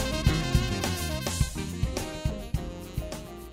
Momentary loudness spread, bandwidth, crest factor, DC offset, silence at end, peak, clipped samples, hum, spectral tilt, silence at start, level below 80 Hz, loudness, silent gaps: 10 LU; 16 kHz; 22 dB; under 0.1%; 0 s; -8 dBFS; under 0.1%; none; -4.5 dB/octave; 0 s; -34 dBFS; -30 LUFS; none